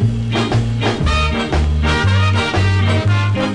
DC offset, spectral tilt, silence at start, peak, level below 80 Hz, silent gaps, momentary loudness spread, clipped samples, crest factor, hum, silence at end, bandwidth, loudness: under 0.1%; -6 dB/octave; 0 s; -4 dBFS; -22 dBFS; none; 3 LU; under 0.1%; 10 dB; none; 0 s; 10.5 kHz; -16 LUFS